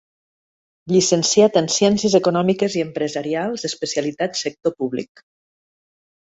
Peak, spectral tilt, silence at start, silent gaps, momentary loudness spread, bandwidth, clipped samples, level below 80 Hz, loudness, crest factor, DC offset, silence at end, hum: -2 dBFS; -4 dB/octave; 0.85 s; none; 10 LU; 8.2 kHz; under 0.1%; -60 dBFS; -19 LUFS; 18 dB; under 0.1%; 1.35 s; none